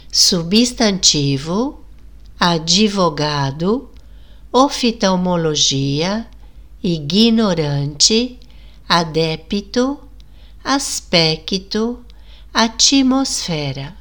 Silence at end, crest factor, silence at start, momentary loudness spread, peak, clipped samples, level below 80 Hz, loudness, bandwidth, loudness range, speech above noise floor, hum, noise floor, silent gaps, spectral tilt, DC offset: 0 s; 18 dB; 0.1 s; 10 LU; 0 dBFS; under 0.1%; -40 dBFS; -16 LUFS; 19.5 kHz; 3 LU; 25 dB; none; -40 dBFS; none; -3.5 dB/octave; 0.8%